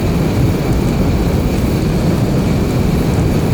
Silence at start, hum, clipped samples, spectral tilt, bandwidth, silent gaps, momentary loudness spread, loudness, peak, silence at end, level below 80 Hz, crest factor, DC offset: 0 s; none; under 0.1%; -7 dB/octave; over 20 kHz; none; 1 LU; -15 LUFS; -2 dBFS; 0 s; -22 dBFS; 10 dB; under 0.1%